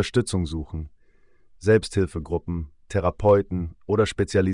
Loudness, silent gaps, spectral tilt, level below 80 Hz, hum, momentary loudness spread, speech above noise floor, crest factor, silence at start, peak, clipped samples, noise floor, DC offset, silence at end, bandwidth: -24 LUFS; none; -6.5 dB/octave; -42 dBFS; none; 13 LU; 32 dB; 18 dB; 0 s; -6 dBFS; under 0.1%; -55 dBFS; under 0.1%; 0 s; 10.5 kHz